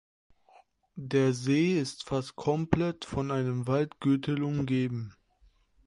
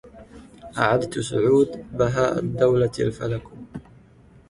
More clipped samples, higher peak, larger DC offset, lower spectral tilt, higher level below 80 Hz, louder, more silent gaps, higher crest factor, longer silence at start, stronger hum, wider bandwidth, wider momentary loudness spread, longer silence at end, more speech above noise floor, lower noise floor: neither; second, -10 dBFS vs -4 dBFS; neither; about the same, -7 dB/octave vs -6.5 dB/octave; second, -56 dBFS vs -50 dBFS; second, -29 LUFS vs -22 LUFS; neither; about the same, 22 dB vs 18 dB; first, 0.95 s vs 0.05 s; neither; about the same, 11.5 kHz vs 11.5 kHz; second, 8 LU vs 19 LU; about the same, 0.75 s vs 0.7 s; first, 36 dB vs 30 dB; first, -64 dBFS vs -51 dBFS